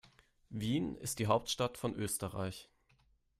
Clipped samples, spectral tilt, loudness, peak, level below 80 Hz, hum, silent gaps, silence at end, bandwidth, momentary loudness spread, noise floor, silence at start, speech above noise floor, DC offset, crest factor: under 0.1%; -4.5 dB/octave; -37 LUFS; -16 dBFS; -62 dBFS; none; none; 0.75 s; 15.5 kHz; 10 LU; -72 dBFS; 0.5 s; 35 dB; under 0.1%; 22 dB